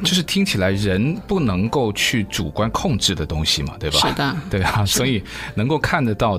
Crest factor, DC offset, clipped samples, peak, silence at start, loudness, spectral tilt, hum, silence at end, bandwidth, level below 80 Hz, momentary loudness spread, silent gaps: 16 dB; under 0.1%; under 0.1%; -4 dBFS; 0 s; -19 LUFS; -4 dB/octave; none; 0 s; 16 kHz; -36 dBFS; 4 LU; none